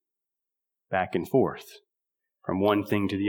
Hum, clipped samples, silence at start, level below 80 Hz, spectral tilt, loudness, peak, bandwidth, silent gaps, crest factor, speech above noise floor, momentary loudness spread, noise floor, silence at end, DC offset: none; under 0.1%; 0.9 s; -66 dBFS; -7 dB/octave; -27 LUFS; -8 dBFS; over 20 kHz; none; 20 dB; 61 dB; 10 LU; -87 dBFS; 0 s; under 0.1%